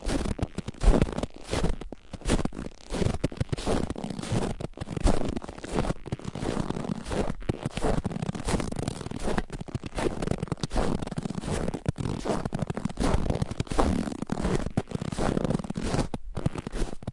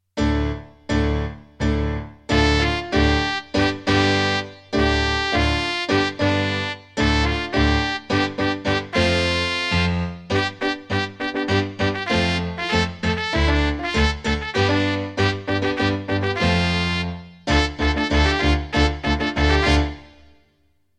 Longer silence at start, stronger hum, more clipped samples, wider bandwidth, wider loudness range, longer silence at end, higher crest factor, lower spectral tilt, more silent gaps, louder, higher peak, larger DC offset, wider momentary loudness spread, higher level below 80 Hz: second, 0 s vs 0.15 s; neither; neither; about the same, 11.5 kHz vs 10.5 kHz; about the same, 2 LU vs 2 LU; second, 0 s vs 0.9 s; first, 24 dB vs 18 dB; about the same, -6 dB/octave vs -5.5 dB/octave; neither; second, -31 LUFS vs -21 LUFS; about the same, -4 dBFS vs -4 dBFS; first, 0.1% vs under 0.1%; about the same, 7 LU vs 7 LU; second, -34 dBFS vs -28 dBFS